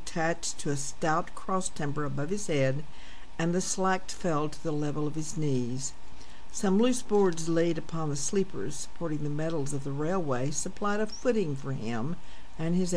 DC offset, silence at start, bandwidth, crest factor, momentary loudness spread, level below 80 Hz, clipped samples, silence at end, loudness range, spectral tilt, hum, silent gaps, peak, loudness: 3%; 0 s; 11 kHz; 16 dB; 10 LU; -50 dBFS; under 0.1%; 0 s; 2 LU; -5 dB/octave; none; none; -14 dBFS; -31 LUFS